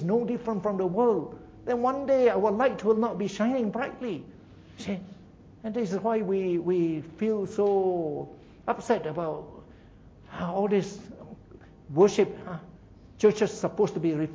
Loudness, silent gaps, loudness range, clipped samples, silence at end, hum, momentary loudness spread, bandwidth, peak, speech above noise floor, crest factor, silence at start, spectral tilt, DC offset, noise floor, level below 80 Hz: -27 LUFS; none; 6 LU; under 0.1%; 0 s; none; 16 LU; 7.8 kHz; -8 dBFS; 25 dB; 18 dB; 0 s; -7 dB/octave; under 0.1%; -52 dBFS; -60 dBFS